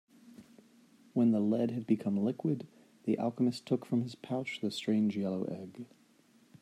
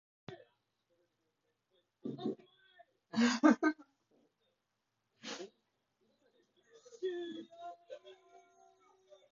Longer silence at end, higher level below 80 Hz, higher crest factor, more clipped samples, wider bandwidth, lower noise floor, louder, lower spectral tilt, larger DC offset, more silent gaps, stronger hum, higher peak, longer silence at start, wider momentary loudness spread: second, 0.75 s vs 1.2 s; first, -80 dBFS vs -86 dBFS; second, 18 dB vs 26 dB; neither; first, 12 kHz vs 7.2 kHz; second, -65 dBFS vs -85 dBFS; about the same, -33 LUFS vs -35 LUFS; first, -7 dB/octave vs -3.5 dB/octave; neither; neither; neither; about the same, -16 dBFS vs -14 dBFS; about the same, 0.25 s vs 0.3 s; second, 11 LU vs 25 LU